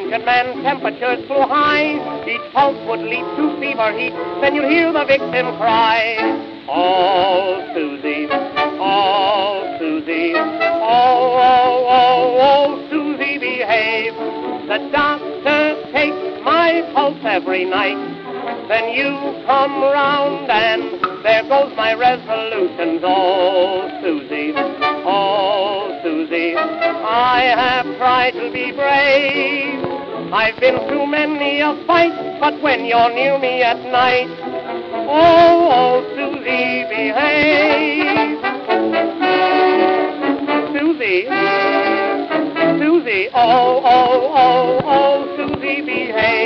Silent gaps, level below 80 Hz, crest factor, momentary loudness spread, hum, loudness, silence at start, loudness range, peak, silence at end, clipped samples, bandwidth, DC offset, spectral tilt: none; -56 dBFS; 16 dB; 9 LU; none; -15 LUFS; 0 s; 4 LU; 0 dBFS; 0 s; under 0.1%; 6.4 kHz; under 0.1%; -6 dB/octave